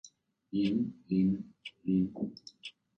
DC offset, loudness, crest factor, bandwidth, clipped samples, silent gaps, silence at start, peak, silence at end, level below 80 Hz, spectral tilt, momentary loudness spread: under 0.1%; -33 LUFS; 16 dB; 8.4 kHz; under 0.1%; none; 0.05 s; -18 dBFS; 0.3 s; -64 dBFS; -7.5 dB/octave; 17 LU